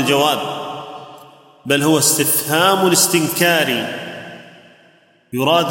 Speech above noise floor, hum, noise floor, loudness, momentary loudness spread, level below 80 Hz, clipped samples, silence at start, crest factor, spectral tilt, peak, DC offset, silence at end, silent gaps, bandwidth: 37 dB; none; -52 dBFS; -15 LUFS; 20 LU; -64 dBFS; under 0.1%; 0 s; 16 dB; -3 dB/octave; -2 dBFS; under 0.1%; 0 s; none; 17 kHz